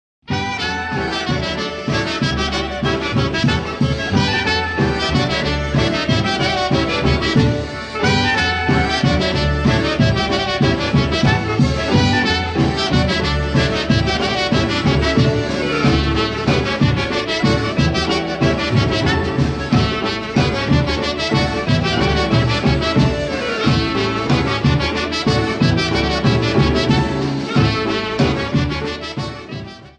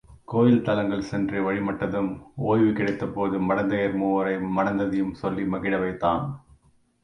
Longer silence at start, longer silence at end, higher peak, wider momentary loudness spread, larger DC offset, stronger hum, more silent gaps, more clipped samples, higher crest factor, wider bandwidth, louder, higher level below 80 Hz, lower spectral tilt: first, 0.3 s vs 0.1 s; second, 0.1 s vs 0.65 s; first, -2 dBFS vs -8 dBFS; about the same, 5 LU vs 7 LU; neither; neither; neither; neither; about the same, 14 dB vs 18 dB; about the same, 9.8 kHz vs 10 kHz; first, -17 LUFS vs -25 LUFS; first, -30 dBFS vs -52 dBFS; second, -5.5 dB/octave vs -8.5 dB/octave